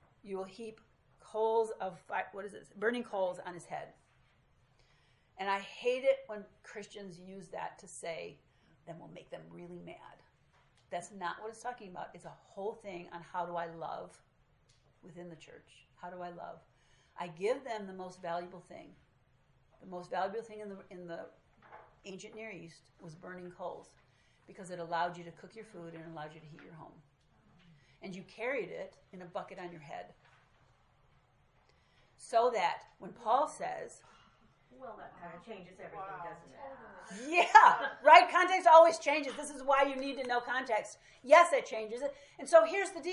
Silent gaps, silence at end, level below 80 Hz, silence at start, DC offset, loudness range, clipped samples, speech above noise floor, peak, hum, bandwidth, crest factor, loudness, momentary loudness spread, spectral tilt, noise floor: none; 0 s; -74 dBFS; 0.25 s; under 0.1%; 22 LU; under 0.1%; 36 dB; -4 dBFS; none; 11.5 kHz; 30 dB; -31 LUFS; 25 LU; -3.5 dB/octave; -69 dBFS